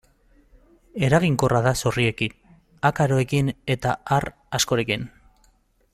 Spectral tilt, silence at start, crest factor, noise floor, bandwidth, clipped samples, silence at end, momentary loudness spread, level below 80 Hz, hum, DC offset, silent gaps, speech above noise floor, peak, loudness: -5 dB/octave; 0.95 s; 20 dB; -61 dBFS; 15 kHz; under 0.1%; 0.85 s; 9 LU; -48 dBFS; none; under 0.1%; none; 39 dB; -4 dBFS; -22 LUFS